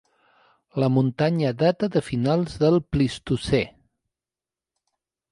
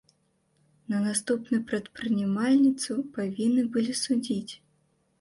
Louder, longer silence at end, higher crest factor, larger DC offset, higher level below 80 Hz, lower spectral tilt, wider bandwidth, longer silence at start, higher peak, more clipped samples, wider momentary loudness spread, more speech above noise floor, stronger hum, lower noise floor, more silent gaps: first, -23 LUFS vs -27 LUFS; first, 1.6 s vs 0.65 s; about the same, 18 dB vs 14 dB; neither; first, -48 dBFS vs -68 dBFS; first, -7.5 dB/octave vs -4.5 dB/octave; about the same, 11 kHz vs 11.5 kHz; second, 0.75 s vs 0.9 s; first, -8 dBFS vs -14 dBFS; neither; second, 4 LU vs 10 LU; first, over 68 dB vs 44 dB; neither; first, under -90 dBFS vs -70 dBFS; neither